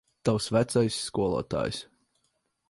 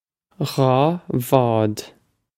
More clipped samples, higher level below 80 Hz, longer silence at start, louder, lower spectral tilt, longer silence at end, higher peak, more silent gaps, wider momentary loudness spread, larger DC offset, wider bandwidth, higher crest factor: neither; about the same, -54 dBFS vs -56 dBFS; second, 0.25 s vs 0.4 s; second, -28 LUFS vs -20 LUFS; second, -5.5 dB/octave vs -7 dB/octave; first, 0.85 s vs 0.5 s; second, -12 dBFS vs 0 dBFS; neither; second, 6 LU vs 10 LU; neither; second, 11.5 kHz vs 16.5 kHz; about the same, 16 dB vs 20 dB